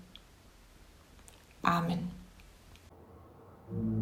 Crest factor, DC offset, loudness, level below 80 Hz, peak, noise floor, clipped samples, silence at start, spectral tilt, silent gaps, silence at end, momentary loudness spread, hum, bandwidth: 28 dB; under 0.1%; -34 LUFS; -58 dBFS; -10 dBFS; -58 dBFS; under 0.1%; 0 s; -6.5 dB/octave; none; 0 s; 26 LU; none; 16.5 kHz